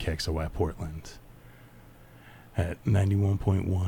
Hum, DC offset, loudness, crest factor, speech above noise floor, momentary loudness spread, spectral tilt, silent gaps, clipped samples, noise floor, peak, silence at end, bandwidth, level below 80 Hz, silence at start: none; under 0.1%; -29 LUFS; 16 dB; 24 dB; 16 LU; -7 dB/octave; none; under 0.1%; -52 dBFS; -14 dBFS; 0 s; 14 kHz; -42 dBFS; 0 s